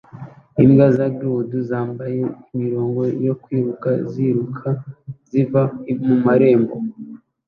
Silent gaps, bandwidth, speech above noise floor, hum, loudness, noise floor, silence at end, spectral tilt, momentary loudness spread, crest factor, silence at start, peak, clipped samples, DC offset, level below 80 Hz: none; 4.6 kHz; 20 dB; none; -19 LUFS; -38 dBFS; 0.3 s; -11 dB/octave; 15 LU; 18 dB; 0.15 s; 0 dBFS; under 0.1%; under 0.1%; -54 dBFS